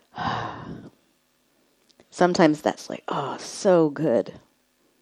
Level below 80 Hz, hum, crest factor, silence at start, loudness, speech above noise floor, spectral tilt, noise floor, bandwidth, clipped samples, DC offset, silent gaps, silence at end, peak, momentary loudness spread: -62 dBFS; none; 22 dB; 0.15 s; -23 LUFS; 44 dB; -5.5 dB/octave; -66 dBFS; 12.5 kHz; under 0.1%; under 0.1%; none; 0.65 s; -2 dBFS; 19 LU